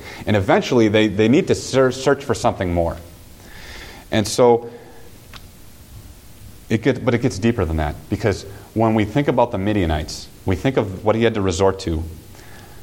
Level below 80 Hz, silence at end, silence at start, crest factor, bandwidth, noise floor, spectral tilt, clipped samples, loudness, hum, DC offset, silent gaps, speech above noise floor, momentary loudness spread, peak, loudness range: -38 dBFS; 0 s; 0 s; 18 dB; 17 kHz; -42 dBFS; -6 dB/octave; under 0.1%; -19 LUFS; none; under 0.1%; none; 24 dB; 13 LU; -2 dBFS; 5 LU